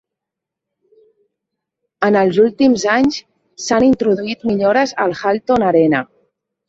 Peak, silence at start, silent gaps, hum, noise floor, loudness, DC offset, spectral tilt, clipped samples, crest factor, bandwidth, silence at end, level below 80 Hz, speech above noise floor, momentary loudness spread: -2 dBFS; 2 s; none; none; -83 dBFS; -15 LUFS; under 0.1%; -5 dB/octave; under 0.1%; 16 dB; 7.8 kHz; 0.65 s; -50 dBFS; 69 dB; 7 LU